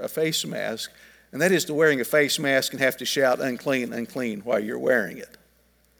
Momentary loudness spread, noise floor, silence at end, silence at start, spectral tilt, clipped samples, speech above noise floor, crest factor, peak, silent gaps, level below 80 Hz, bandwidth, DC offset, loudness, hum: 10 LU; -62 dBFS; 0.75 s; 0 s; -3.5 dB/octave; under 0.1%; 38 dB; 20 dB; -6 dBFS; none; -68 dBFS; over 20 kHz; under 0.1%; -24 LUFS; none